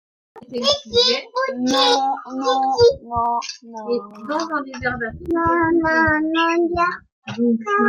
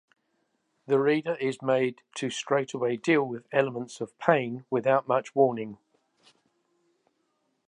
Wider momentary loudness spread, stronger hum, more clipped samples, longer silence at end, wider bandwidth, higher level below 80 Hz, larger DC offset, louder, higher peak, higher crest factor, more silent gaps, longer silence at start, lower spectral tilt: about the same, 10 LU vs 9 LU; neither; neither; second, 0 s vs 1.95 s; about the same, 11.5 kHz vs 10.5 kHz; first, -48 dBFS vs -80 dBFS; neither; first, -19 LUFS vs -27 LUFS; about the same, -2 dBFS vs -4 dBFS; second, 16 dB vs 24 dB; first, 7.12-7.22 s vs none; second, 0.35 s vs 0.9 s; second, -4 dB/octave vs -5.5 dB/octave